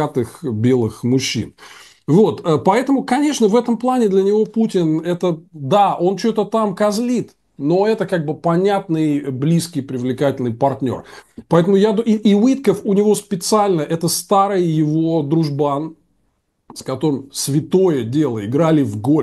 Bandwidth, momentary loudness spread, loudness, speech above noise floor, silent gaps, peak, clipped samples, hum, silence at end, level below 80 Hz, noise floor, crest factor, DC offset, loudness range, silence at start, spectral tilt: 12.5 kHz; 8 LU; -17 LUFS; 49 dB; none; 0 dBFS; under 0.1%; none; 0 s; -58 dBFS; -66 dBFS; 16 dB; under 0.1%; 3 LU; 0 s; -6 dB/octave